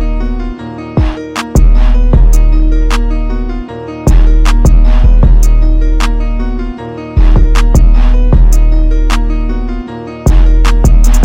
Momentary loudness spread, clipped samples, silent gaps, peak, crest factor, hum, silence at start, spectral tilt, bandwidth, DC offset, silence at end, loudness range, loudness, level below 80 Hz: 11 LU; 0.4%; none; 0 dBFS; 6 dB; none; 0 s; -6.5 dB/octave; 9.4 kHz; under 0.1%; 0 s; 1 LU; -12 LUFS; -6 dBFS